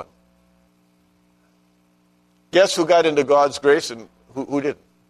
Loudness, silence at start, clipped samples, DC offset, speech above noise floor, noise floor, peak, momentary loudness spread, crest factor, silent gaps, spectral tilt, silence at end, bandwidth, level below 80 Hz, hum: -18 LUFS; 0 s; under 0.1%; under 0.1%; 42 dB; -60 dBFS; -4 dBFS; 16 LU; 18 dB; none; -3.5 dB/octave; 0.35 s; 13.5 kHz; -66 dBFS; 60 Hz at -60 dBFS